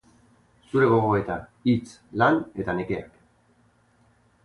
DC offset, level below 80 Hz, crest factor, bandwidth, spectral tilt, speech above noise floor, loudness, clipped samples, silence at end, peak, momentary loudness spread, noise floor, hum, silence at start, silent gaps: under 0.1%; -54 dBFS; 18 dB; 11 kHz; -8 dB/octave; 39 dB; -24 LUFS; under 0.1%; 1.4 s; -8 dBFS; 12 LU; -62 dBFS; none; 0.75 s; none